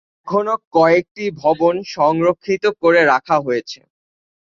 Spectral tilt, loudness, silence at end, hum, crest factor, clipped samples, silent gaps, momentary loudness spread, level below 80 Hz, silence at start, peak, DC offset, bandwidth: -6 dB/octave; -16 LUFS; 0.85 s; none; 16 dB; under 0.1%; 0.67-0.71 s, 1.11-1.15 s; 9 LU; -58 dBFS; 0.25 s; 0 dBFS; under 0.1%; 7.4 kHz